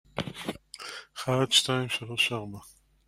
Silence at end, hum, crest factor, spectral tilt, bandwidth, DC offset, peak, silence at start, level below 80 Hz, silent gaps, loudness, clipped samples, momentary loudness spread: 0.35 s; none; 24 dB; -3 dB/octave; 16 kHz; under 0.1%; -8 dBFS; 0.15 s; -62 dBFS; none; -27 LUFS; under 0.1%; 18 LU